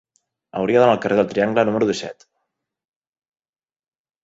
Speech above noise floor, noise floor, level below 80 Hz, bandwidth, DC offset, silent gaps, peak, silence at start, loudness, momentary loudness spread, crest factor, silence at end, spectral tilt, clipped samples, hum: 59 dB; -77 dBFS; -60 dBFS; 8 kHz; under 0.1%; none; -2 dBFS; 0.55 s; -18 LUFS; 13 LU; 20 dB; 2.1 s; -6 dB/octave; under 0.1%; none